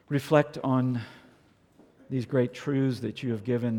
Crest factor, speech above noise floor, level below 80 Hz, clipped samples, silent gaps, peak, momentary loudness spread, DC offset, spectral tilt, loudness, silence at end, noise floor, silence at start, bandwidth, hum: 22 dB; 34 dB; -68 dBFS; under 0.1%; none; -8 dBFS; 10 LU; under 0.1%; -8 dB/octave; -28 LUFS; 0 s; -61 dBFS; 0.1 s; 17.5 kHz; none